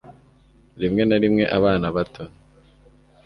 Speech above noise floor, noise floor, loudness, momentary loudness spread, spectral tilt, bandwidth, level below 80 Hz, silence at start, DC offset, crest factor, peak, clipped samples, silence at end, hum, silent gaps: 35 dB; -54 dBFS; -20 LUFS; 15 LU; -8.5 dB/octave; 5.8 kHz; -46 dBFS; 0.1 s; under 0.1%; 18 dB; -4 dBFS; under 0.1%; 1 s; none; none